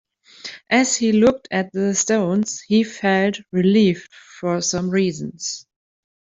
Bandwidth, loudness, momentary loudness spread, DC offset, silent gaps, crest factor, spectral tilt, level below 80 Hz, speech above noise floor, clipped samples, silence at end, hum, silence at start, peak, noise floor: 8 kHz; -19 LUFS; 12 LU; under 0.1%; none; 16 dB; -4.5 dB/octave; -58 dBFS; 20 dB; under 0.1%; 0.65 s; none; 0.45 s; -4 dBFS; -39 dBFS